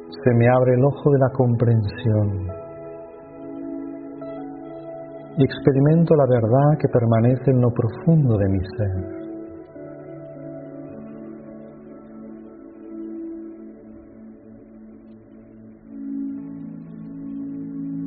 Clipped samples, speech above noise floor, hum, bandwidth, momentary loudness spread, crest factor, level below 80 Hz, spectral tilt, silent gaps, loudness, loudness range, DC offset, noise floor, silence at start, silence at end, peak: under 0.1%; 27 dB; none; 4.6 kHz; 23 LU; 22 dB; -52 dBFS; -9 dB/octave; none; -20 LUFS; 20 LU; under 0.1%; -44 dBFS; 0 s; 0 s; 0 dBFS